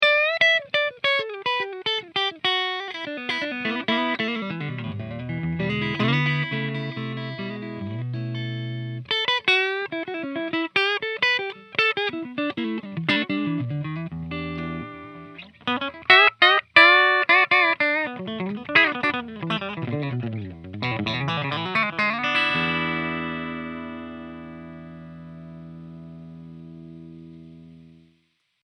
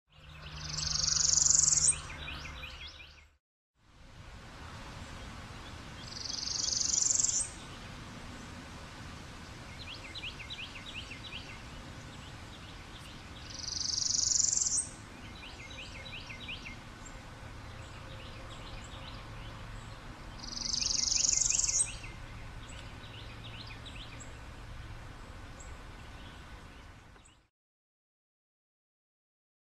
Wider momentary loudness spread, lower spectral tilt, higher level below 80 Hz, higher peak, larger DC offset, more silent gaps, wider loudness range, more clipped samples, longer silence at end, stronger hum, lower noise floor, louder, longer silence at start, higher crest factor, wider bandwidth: about the same, 24 LU vs 22 LU; first, -5.5 dB/octave vs -0.5 dB/octave; second, -58 dBFS vs -52 dBFS; first, 0 dBFS vs -12 dBFS; neither; second, none vs 3.40-3.74 s; second, 15 LU vs 19 LU; neither; second, 0.75 s vs 2.35 s; first, 60 Hz at -60 dBFS vs none; first, -68 dBFS vs -58 dBFS; first, -22 LUFS vs -30 LUFS; second, 0 s vs 0.15 s; about the same, 24 dB vs 26 dB; second, 10 kHz vs 13.5 kHz